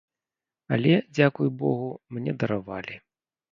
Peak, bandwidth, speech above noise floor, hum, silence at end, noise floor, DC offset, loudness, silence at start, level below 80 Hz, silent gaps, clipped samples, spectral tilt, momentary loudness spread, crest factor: -6 dBFS; 7.4 kHz; over 65 dB; none; 0.55 s; under -90 dBFS; under 0.1%; -26 LUFS; 0.7 s; -64 dBFS; none; under 0.1%; -8 dB/octave; 14 LU; 22 dB